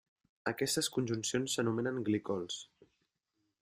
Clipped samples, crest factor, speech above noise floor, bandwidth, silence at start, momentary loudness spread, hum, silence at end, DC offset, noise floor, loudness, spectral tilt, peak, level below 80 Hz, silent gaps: under 0.1%; 18 dB; 48 dB; 16 kHz; 0.45 s; 9 LU; none; 0.95 s; under 0.1%; -83 dBFS; -35 LUFS; -4 dB/octave; -18 dBFS; -74 dBFS; none